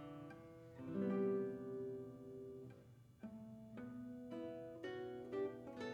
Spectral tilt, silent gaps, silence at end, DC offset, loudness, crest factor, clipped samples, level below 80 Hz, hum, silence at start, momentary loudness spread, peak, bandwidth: -8 dB/octave; none; 0 s; under 0.1%; -48 LUFS; 18 dB; under 0.1%; -78 dBFS; none; 0 s; 16 LU; -30 dBFS; 10.5 kHz